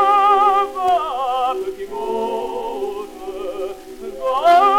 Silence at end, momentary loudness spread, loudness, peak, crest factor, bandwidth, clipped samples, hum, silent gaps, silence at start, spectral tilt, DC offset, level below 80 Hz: 0 s; 16 LU; -19 LUFS; -4 dBFS; 14 dB; 16.5 kHz; under 0.1%; none; none; 0 s; -3.5 dB/octave; under 0.1%; -50 dBFS